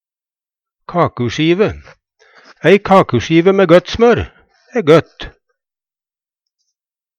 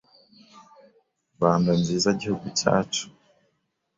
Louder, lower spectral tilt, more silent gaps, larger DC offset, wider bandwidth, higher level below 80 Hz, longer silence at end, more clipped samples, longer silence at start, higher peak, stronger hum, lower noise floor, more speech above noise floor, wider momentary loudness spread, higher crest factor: first, -12 LUFS vs -24 LUFS; first, -6.5 dB/octave vs -5 dB/octave; neither; neither; first, 9.4 kHz vs 7.8 kHz; first, -40 dBFS vs -58 dBFS; first, 1.9 s vs 0.9 s; neither; second, 0.9 s vs 1.4 s; first, 0 dBFS vs -4 dBFS; neither; first, under -90 dBFS vs -74 dBFS; first, over 78 dB vs 51 dB; first, 13 LU vs 8 LU; second, 14 dB vs 24 dB